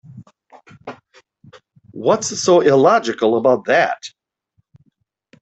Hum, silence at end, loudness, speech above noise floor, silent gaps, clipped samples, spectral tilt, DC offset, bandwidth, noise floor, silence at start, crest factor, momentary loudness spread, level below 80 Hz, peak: none; 1.35 s; -15 LUFS; 51 dB; none; under 0.1%; -4.5 dB/octave; under 0.1%; 8.4 kHz; -66 dBFS; 0.15 s; 16 dB; 24 LU; -64 dBFS; -2 dBFS